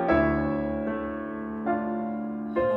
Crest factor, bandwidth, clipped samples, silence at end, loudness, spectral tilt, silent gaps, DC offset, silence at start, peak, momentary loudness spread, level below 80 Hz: 18 dB; 5.6 kHz; under 0.1%; 0 s; -28 LUFS; -10 dB/octave; none; under 0.1%; 0 s; -10 dBFS; 9 LU; -44 dBFS